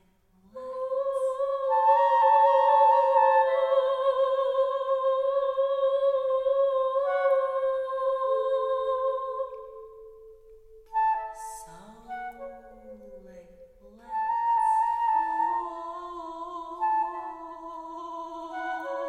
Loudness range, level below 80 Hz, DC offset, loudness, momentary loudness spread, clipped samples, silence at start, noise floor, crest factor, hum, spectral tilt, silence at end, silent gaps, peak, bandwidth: 13 LU; -64 dBFS; under 0.1%; -25 LUFS; 19 LU; under 0.1%; 0.55 s; -62 dBFS; 16 dB; none; -3 dB/octave; 0 s; none; -10 dBFS; 10.5 kHz